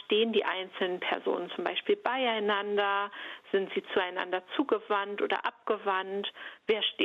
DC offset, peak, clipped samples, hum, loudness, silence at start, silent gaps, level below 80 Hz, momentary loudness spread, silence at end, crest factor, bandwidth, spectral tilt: under 0.1%; -12 dBFS; under 0.1%; none; -31 LUFS; 0 s; none; -80 dBFS; 5 LU; 0 s; 18 dB; 5.6 kHz; -5.5 dB/octave